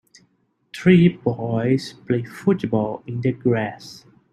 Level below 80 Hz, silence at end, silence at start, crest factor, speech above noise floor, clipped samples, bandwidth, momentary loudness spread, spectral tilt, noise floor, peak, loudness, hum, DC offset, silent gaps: -58 dBFS; 0.35 s; 0.75 s; 18 dB; 45 dB; under 0.1%; 10 kHz; 13 LU; -8 dB/octave; -65 dBFS; -2 dBFS; -21 LUFS; none; under 0.1%; none